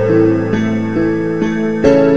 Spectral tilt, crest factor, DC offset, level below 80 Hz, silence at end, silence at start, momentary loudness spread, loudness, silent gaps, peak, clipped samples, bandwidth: -8 dB/octave; 12 dB; 2%; -38 dBFS; 0 s; 0 s; 5 LU; -14 LUFS; none; 0 dBFS; under 0.1%; 7.4 kHz